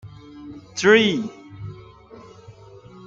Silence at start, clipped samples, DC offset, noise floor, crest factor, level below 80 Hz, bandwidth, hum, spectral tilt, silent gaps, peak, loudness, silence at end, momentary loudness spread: 0.05 s; under 0.1%; under 0.1%; -45 dBFS; 22 dB; -58 dBFS; 7.8 kHz; none; -4.5 dB/octave; none; -2 dBFS; -18 LUFS; 0.55 s; 26 LU